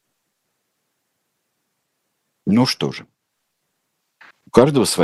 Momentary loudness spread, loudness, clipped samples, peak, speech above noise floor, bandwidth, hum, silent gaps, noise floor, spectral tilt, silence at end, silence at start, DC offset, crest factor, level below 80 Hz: 14 LU; -17 LUFS; under 0.1%; 0 dBFS; 58 dB; 12.5 kHz; none; none; -74 dBFS; -5 dB/octave; 0 s; 2.45 s; under 0.1%; 22 dB; -54 dBFS